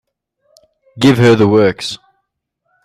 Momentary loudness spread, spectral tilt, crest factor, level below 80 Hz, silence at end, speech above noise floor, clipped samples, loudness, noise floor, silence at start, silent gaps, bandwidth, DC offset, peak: 15 LU; -6.5 dB/octave; 14 dB; -50 dBFS; 0.9 s; 60 dB; under 0.1%; -11 LUFS; -70 dBFS; 0.95 s; none; 15 kHz; under 0.1%; 0 dBFS